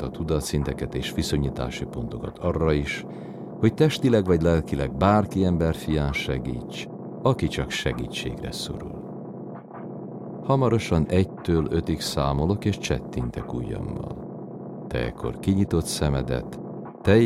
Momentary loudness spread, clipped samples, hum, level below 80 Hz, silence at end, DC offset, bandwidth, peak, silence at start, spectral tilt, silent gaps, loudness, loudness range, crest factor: 15 LU; under 0.1%; none; -38 dBFS; 0 s; under 0.1%; 15.5 kHz; -4 dBFS; 0 s; -6.5 dB/octave; none; -25 LUFS; 6 LU; 20 dB